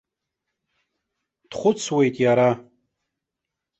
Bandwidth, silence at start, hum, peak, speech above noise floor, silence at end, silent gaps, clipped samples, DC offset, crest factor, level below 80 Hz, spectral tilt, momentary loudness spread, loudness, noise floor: 8.2 kHz; 1.5 s; none; -6 dBFS; 65 dB; 1.2 s; none; under 0.1%; under 0.1%; 18 dB; -64 dBFS; -5.5 dB/octave; 11 LU; -21 LUFS; -84 dBFS